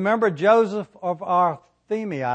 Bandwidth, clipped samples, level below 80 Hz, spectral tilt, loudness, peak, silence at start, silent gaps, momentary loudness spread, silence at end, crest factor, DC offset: 8.8 kHz; under 0.1%; -70 dBFS; -7 dB/octave; -22 LUFS; -4 dBFS; 0 s; none; 11 LU; 0 s; 16 dB; under 0.1%